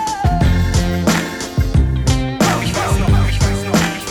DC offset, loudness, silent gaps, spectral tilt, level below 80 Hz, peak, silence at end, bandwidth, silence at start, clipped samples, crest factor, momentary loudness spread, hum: 0.2%; -16 LUFS; none; -5 dB/octave; -20 dBFS; -4 dBFS; 0 s; 19 kHz; 0 s; under 0.1%; 12 dB; 3 LU; none